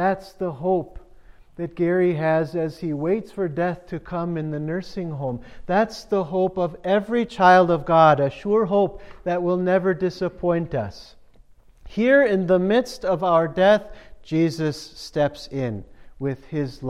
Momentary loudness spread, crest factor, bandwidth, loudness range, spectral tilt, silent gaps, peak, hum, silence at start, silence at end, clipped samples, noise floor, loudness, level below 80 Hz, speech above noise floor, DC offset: 14 LU; 18 dB; 13 kHz; 7 LU; -7 dB/octave; none; -4 dBFS; none; 0 s; 0 s; under 0.1%; -50 dBFS; -22 LUFS; -50 dBFS; 29 dB; under 0.1%